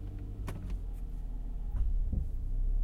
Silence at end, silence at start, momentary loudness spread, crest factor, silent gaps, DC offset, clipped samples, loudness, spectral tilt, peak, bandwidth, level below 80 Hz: 0 s; 0 s; 7 LU; 12 dB; none; under 0.1%; under 0.1%; -40 LUFS; -8 dB/octave; -20 dBFS; 3.3 kHz; -34 dBFS